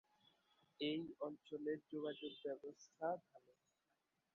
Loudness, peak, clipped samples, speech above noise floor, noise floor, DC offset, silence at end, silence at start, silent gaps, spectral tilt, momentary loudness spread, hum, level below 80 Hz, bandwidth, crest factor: -48 LUFS; -32 dBFS; under 0.1%; 40 dB; -87 dBFS; under 0.1%; 0.95 s; 0.8 s; none; -3.5 dB/octave; 6 LU; none; under -90 dBFS; 7.2 kHz; 18 dB